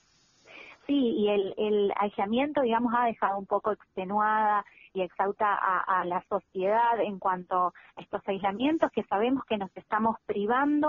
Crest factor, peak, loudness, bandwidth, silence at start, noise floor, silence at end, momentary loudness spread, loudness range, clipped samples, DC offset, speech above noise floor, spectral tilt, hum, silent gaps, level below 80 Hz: 18 dB; -10 dBFS; -28 LUFS; 6.8 kHz; 0.5 s; -62 dBFS; 0 s; 8 LU; 2 LU; under 0.1%; under 0.1%; 34 dB; -3.5 dB/octave; none; none; -68 dBFS